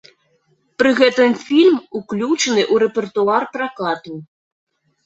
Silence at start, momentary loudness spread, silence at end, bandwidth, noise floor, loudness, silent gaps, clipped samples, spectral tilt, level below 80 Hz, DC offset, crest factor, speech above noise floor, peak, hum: 0.8 s; 12 LU; 0.8 s; 8.2 kHz; -62 dBFS; -17 LUFS; none; under 0.1%; -4 dB/octave; -64 dBFS; under 0.1%; 16 dB; 46 dB; -2 dBFS; none